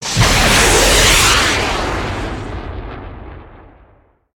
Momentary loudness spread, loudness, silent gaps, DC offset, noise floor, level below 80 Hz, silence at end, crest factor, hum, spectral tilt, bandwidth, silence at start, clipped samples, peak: 21 LU; -11 LUFS; none; under 0.1%; -51 dBFS; -24 dBFS; 0.8 s; 16 dB; none; -2.5 dB/octave; 19 kHz; 0 s; under 0.1%; 0 dBFS